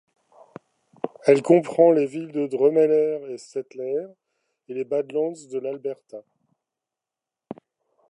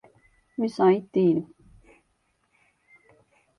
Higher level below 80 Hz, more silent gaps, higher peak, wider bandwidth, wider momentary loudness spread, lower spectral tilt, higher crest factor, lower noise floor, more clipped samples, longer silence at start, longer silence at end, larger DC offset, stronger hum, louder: second, -82 dBFS vs -66 dBFS; neither; first, -4 dBFS vs -8 dBFS; about the same, 10.5 kHz vs 10.5 kHz; first, 25 LU vs 16 LU; second, -7 dB/octave vs -8.5 dB/octave; about the same, 20 dB vs 20 dB; first, -88 dBFS vs -71 dBFS; neither; first, 1.05 s vs 0.6 s; second, 0.55 s vs 2.15 s; neither; neither; about the same, -22 LUFS vs -24 LUFS